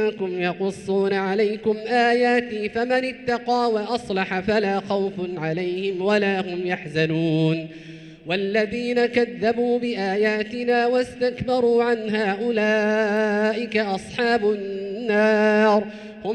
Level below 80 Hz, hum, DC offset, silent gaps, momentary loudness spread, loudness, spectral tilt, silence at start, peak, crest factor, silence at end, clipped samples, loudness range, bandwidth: -58 dBFS; none; under 0.1%; none; 7 LU; -22 LUFS; -6 dB/octave; 0 s; -6 dBFS; 16 dB; 0 s; under 0.1%; 2 LU; 11 kHz